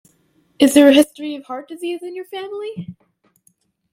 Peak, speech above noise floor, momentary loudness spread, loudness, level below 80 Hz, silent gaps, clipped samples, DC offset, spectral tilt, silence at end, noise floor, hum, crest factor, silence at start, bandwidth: 0 dBFS; 45 dB; 20 LU; -16 LUFS; -64 dBFS; none; under 0.1%; under 0.1%; -4 dB/octave; 1 s; -61 dBFS; none; 18 dB; 0.6 s; 16 kHz